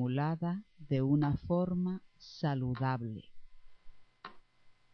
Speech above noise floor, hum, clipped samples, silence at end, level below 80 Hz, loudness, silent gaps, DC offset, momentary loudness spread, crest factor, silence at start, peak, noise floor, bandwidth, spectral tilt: 29 dB; none; under 0.1%; 0.2 s; -58 dBFS; -34 LUFS; none; under 0.1%; 22 LU; 18 dB; 0 s; -18 dBFS; -62 dBFS; 6.4 kHz; -9.5 dB/octave